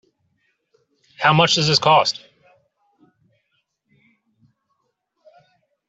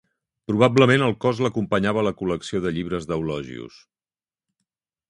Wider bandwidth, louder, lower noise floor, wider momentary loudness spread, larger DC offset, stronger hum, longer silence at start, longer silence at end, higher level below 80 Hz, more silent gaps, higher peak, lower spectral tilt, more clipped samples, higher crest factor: second, 8 kHz vs 11 kHz; first, -16 LUFS vs -22 LUFS; second, -72 dBFS vs under -90 dBFS; second, 8 LU vs 17 LU; neither; neither; first, 1.2 s vs 0.5 s; first, 3.7 s vs 1.4 s; second, -62 dBFS vs -52 dBFS; neither; about the same, -2 dBFS vs -2 dBFS; second, -3.5 dB/octave vs -6.5 dB/octave; neither; about the same, 22 dB vs 22 dB